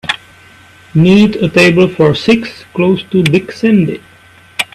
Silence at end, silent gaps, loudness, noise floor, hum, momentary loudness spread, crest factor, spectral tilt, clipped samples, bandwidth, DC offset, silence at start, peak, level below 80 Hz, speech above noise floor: 0.1 s; none; -11 LUFS; -40 dBFS; none; 12 LU; 12 dB; -6.5 dB/octave; under 0.1%; 14 kHz; under 0.1%; 0.05 s; 0 dBFS; -44 dBFS; 30 dB